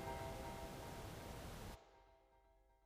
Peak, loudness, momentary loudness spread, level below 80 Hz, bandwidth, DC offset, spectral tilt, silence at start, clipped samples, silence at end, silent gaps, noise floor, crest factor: -36 dBFS; -52 LUFS; 9 LU; -60 dBFS; 15.5 kHz; under 0.1%; -5 dB/octave; 0 s; under 0.1%; 0 s; none; -73 dBFS; 16 dB